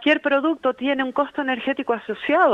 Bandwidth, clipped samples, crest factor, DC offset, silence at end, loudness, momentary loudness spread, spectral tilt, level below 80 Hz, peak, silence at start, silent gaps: 7.6 kHz; under 0.1%; 16 dB; under 0.1%; 0 s; -22 LUFS; 6 LU; -5.5 dB/octave; -66 dBFS; -4 dBFS; 0 s; none